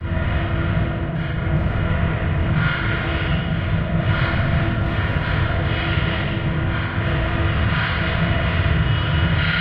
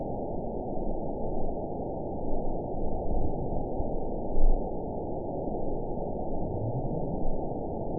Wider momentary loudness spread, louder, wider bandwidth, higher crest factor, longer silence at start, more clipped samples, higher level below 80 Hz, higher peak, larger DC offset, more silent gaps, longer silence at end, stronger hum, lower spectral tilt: about the same, 3 LU vs 3 LU; first, -21 LUFS vs -34 LUFS; first, 5.4 kHz vs 1 kHz; about the same, 14 dB vs 18 dB; about the same, 0 s vs 0 s; neither; first, -26 dBFS vs -32 dBFS; first, -6 dBFS vs -10 dBFS; second, under 0.1% vs 0.9%; neither; about the same, 0 s vs 0 s; neither; second, -9 dB/octave vs -16 dB/octave